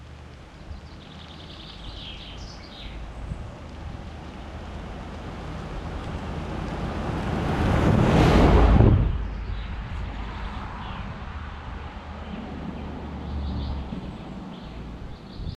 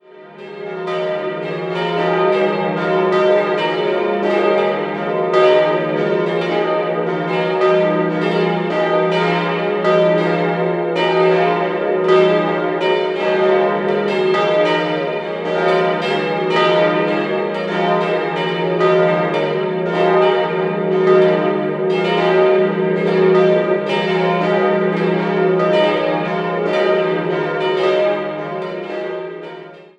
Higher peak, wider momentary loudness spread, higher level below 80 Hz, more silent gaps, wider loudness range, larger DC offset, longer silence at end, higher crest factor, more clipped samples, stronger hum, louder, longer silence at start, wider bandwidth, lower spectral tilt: second, -4 dBFS vs 0 dBFS; first, 22 LU vs 7 LU; first, -32 dBFS vs -64 dBFS; neither; first, 17 LU vs 2 LU; neither; second, 0 s vs 0.15 s; first, 22 dB vs 16 dB; neither; neither; second, -26 LUFS vs -16 LUFS; second, 0 s vs 0.15 s; first, 11.5 kHz vs 8 kHz; about the same, -7.5 dB/octave vs -7 dB/octave